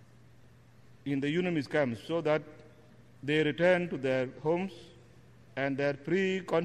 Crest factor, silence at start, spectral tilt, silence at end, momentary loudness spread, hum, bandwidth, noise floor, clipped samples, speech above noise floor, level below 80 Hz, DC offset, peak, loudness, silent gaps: 18 dB; 1.05 s; -7 dB/octave; 0 s; 14 LU; none; 10.5 kHz; -58 dBFS; under 0.1%; 28 dB; -68 dBFS; under 0.1%; -14 dBFS; -31 LUFS; none